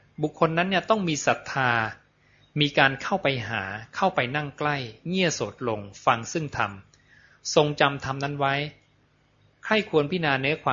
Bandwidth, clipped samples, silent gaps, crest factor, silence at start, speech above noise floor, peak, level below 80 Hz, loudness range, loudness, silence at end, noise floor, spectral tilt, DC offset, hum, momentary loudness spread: 7.6 kHz; under 0.1%; none; 24 dB; 0.2 s; 38 dB; -2 dBFS; -60 dBFS; 3 LU; -25 LUFS; 0 s; -63 dBFS; -4.5 dB/octave; under 0.1%; none; 9 LU